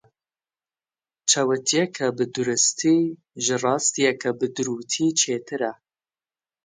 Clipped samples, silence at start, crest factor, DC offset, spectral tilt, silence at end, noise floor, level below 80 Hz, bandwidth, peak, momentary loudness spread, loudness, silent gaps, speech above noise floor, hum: under 0.1%; 1.25 s; 18 dB; under 0.1%; -2.5 dB/octave; 0.9 s; under -90 dBFS; -72 dBFS; 10 kHz; -6 dBFS; 8 LU; -22 LUFS; none; over 67 dB; none